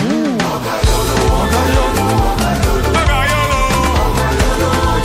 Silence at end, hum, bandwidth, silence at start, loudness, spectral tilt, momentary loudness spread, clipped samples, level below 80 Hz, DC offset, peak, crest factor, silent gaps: 0 s; none; 16 kHz; 0 s; -14 LUFS; -5 dB/octave; 2 LU; under 0.1%; -18 dBFS; under 0.1%; -2 dBFS; 12 dB; none